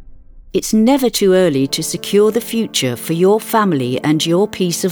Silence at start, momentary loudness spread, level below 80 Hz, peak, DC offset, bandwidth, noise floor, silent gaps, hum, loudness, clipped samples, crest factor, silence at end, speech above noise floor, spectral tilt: 0 s; 6 LU; -46 dBFS; -2 dBFS; under 0.1%; over 20 kHz; -37 dBFS; none; none; -15 LUFS; under 0.1%; 14 dB; 0 s; 23 dB; -4.5 dB/octave